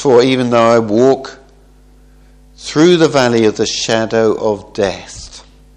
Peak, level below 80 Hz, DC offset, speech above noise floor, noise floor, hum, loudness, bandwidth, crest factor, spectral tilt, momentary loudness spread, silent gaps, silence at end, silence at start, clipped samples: 0 dBFS; -44 dBFS; under 0.1%; 32 dB; -44 dBFS; none; -12 LUFS; 11 kHz; 14 dB; -5 dB/octave; 19 LU; none; 0.35 s; 0 s; 0.1%